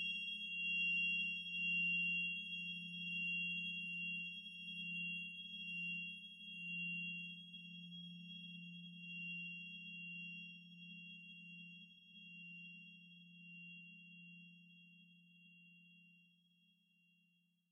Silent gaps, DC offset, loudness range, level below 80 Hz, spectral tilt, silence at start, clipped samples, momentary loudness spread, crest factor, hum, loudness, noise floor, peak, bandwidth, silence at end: none; under 0.1%; 20 LU; under -90 dBFS; -3 dB/octave; 0 s; under 0.1%; 22 LU; 16 dB; none; -43 LUFS; -79 dBFS; -32 dBFS; 10.5 kHz; 1.45 s